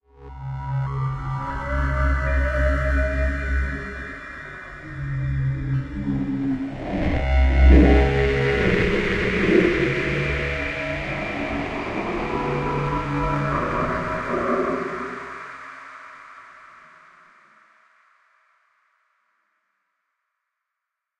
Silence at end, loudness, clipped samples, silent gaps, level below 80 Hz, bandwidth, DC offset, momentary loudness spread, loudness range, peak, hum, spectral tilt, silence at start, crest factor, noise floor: 4.55 s; -23 LUFS; under 0.1%; none; -26 dBFS; 7.6 kHz; under 0.1%; 17 LU; 10 LU; -4 dBFS; none; -7.5 dB/octave; 0.2 s; 20 dB; -83 dBFS